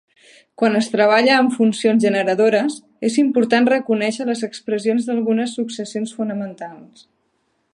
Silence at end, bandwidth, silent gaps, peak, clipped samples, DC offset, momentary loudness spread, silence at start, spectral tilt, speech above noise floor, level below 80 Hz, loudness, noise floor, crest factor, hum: 0.9 s; 11 kHz; none; -2 dBFS; under 0.1%; under 0.1%; 11 LU; 0.6 s; -5 dB/octave; 49 dB; -72 dBFS; -18 LUFS; -67 dBFS; 18 dB; none